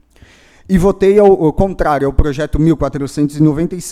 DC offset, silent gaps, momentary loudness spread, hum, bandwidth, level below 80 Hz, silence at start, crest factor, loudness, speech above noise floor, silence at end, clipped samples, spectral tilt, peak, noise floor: under 0.1%; none; 8 LU; none; 14 kHz; -24 dBFS; 0.7 s; 12 dB; -13 LUFS; 33 dB; 0 s; under 0.1%; -7.5 dB/octave; 0 dBFS; -45 dBFS